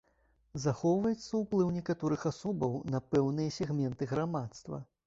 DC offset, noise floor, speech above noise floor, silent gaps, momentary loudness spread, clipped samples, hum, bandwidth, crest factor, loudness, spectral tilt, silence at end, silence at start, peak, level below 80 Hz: under 0.1%; -71 dBFS; 38 dB; none; 8 LU; under 0.1%; none; 8 kHz; 16 dB; -33 LUFS; -7 dB/octave; 0.25 s; 0.55 s; -16 dBFS; -62 dBFS